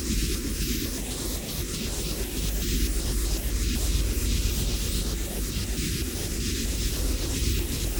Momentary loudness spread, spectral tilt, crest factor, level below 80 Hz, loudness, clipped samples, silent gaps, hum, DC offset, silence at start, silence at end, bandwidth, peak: 3 LU; -3.5 dB/octave; 14 dB; -30 dBFS; -28 LUFS; under 0.1%; none; none; under 0.1%; 0 s; 0 s; over 20 kHz; -14 dBFS